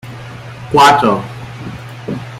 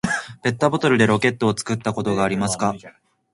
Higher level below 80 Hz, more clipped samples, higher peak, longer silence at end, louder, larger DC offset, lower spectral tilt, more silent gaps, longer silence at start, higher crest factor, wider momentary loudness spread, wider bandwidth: first, -46 dBFS vs -52 dBFS; neither; about the same, 0 dBFS vs -2 dBFS; second, 0 s vs 0.45 s; first, -11 LUFS vs -20 LUFS; neither; about the same, -4.5 dB/octave vs -5 dB/octave; neither; about the same, 0.05 s vs 0.05 s; about the same, 16 dB vs 18 dB; first, 22 LU vs 8 LU; first, 16 kHz vs 11.5 kHz